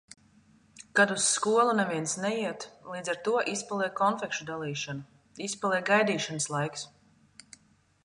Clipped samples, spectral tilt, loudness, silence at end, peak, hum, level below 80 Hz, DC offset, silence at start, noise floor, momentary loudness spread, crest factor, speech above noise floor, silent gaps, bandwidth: under 0.1%; -3 dB/octave; -28 LUFS; 1.15 s; -10 dBFS; none; -74 dBFS; under 0.1%; 0.8 s; -64 dBFS; 13 LU; 20 dB; 36 dB; none; 11.5 kHz